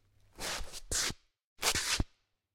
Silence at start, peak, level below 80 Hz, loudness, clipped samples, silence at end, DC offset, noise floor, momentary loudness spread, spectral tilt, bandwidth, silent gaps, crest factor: 0.35 s; -10 dBFS; -46 dBFS; -34 LUFS; under 0.1%; 0.5 s; under 0.1%; -65 dBFS; 11 LU; -1 dB/octave; 16.5 kHz; 1.44-1.56 s; 26 dB